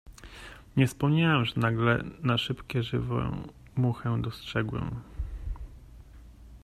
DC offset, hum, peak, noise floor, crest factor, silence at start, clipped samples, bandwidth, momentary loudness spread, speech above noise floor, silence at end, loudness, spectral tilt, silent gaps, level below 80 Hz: under 0.1%; none; -10 dBFS; -49 dBFS; 20 dB; 0.05 s; under 0.1%; 13.5 kHz; 17 LU; 22 dB; 0.05 s; -29 LUFS; -6.5 dB/octave; none; -44 dBFS